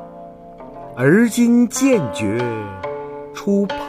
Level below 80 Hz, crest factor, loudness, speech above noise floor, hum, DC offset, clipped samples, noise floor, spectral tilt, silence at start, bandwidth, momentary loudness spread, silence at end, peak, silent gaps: -52 dBFS; 16 dB; -17 LUFS; 21 dB; none; under 0.1%; under 0.1%; -37 dBFS; -5.5 dB/octave; 0 s; 15.5 kHz; 23 LU; 0 s; -2 dBFS; none